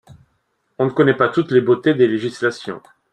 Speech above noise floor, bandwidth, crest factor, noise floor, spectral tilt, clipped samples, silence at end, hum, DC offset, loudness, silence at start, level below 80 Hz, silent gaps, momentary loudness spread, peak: 51 dB; 9.4 kHz; 16 dB; -67 dBFS; -7 dB/octave; under 0.1%; 0.35 s; none; under 0.1%; -17 LUFS; 0.8 s; -60 dBFS; none; 14 LU; -2 dBFS